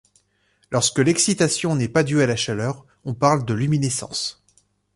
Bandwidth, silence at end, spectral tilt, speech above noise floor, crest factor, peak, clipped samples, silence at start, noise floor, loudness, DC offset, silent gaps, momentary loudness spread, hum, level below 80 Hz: 11.5 kHz; 0.65 s; -4.5 dB/octave; 44 dB; 18 dB; -4 dBFS; under 0.1%; 0.7 s; -64 dBFS; -21 LUFS; under 0.1%; none; 9 LU; 50 Hz at -55 dBFS; -54 dBFS